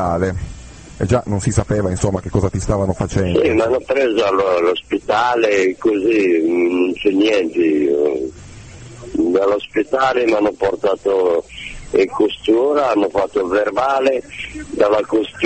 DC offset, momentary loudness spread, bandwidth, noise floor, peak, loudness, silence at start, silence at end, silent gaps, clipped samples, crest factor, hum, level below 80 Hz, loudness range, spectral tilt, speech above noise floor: under 0.1%; 9 LU; 8.8 kHz; -36 dBFS; 0 dBFS; -17 LUFS; 0 s; 0 s; none; under 0.1%; 16 dB; none; -38 dBFS; 2 LU; -6 dB/octave; 20 dB